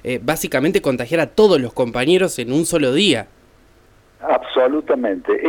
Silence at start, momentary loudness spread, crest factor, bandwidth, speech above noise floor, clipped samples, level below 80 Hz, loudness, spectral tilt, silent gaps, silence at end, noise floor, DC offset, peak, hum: 0.05 s; 6 LU; 18 dB; 19 kHz; 34 dB; under 0.1%; -48 dBFS; -17 LUFS; -4.5 dB/octave; none; 0 s; -51 dBFS; under 0.1%; 0 dBFS; none